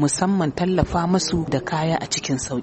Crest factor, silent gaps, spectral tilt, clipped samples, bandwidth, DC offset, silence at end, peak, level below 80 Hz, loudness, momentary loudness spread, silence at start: 16 dB; none; -5 dB/octave; under 0.1%; 8.8 kHz; under 0.1%; 0 s; -6 dBFS; -40 dBFS; -22 LUFS; 3 LU; 0 s